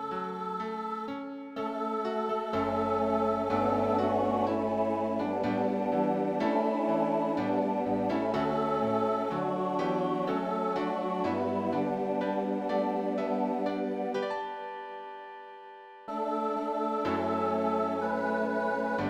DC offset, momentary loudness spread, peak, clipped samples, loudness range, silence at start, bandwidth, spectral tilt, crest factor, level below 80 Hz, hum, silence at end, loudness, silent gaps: under 0.1%; 8 LU; -16 dBFS; under 0.1%; 5 LU; 0 s; 12.5 kHz; -7.5 dB/octave; 14 dB; -64 dBFS; none; 0 s; -30 LUFS; none